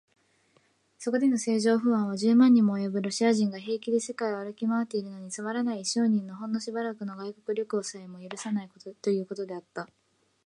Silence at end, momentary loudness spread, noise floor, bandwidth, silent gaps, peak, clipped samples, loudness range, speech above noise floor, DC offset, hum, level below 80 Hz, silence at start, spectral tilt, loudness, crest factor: 0.6 s; 15 LU; -67 dBFS; 11.5 kHz; none; -10 dBFS; under 0.1%; 9 LU; 40 dB; under 0.1%; none; -80 dBFS; 1 s; -5 dB/octave; -28 LUFS; 18 dB